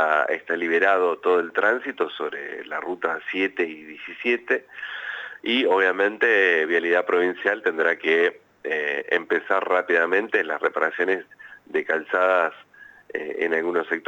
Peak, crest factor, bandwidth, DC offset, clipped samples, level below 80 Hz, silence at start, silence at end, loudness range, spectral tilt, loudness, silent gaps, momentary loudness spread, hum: -6 dBFS; 18 dB; 8 kHz; under 0.1%; under 0.1%; -78 dBFS; 0 s; 0.1 s; 5 LU; -4.5 dB/octave; -23 LUFS; none; 12 LU; none